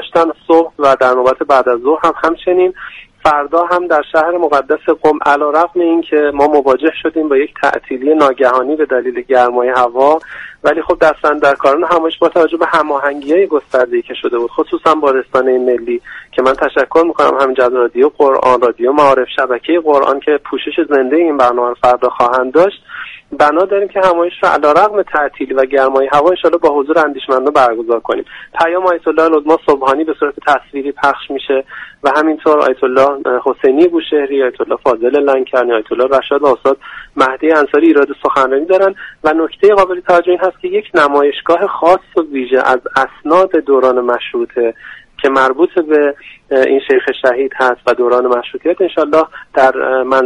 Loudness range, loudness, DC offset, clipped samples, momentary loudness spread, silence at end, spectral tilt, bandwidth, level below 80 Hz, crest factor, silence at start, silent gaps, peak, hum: 2 LU; -12 LUFS; under 0.1%; under 0.1%; 6 LU; 0 s; -5 dB/octave; 11 kHz; -48 dBFS; 12 dB; 0 s; none; 0 dBFS; none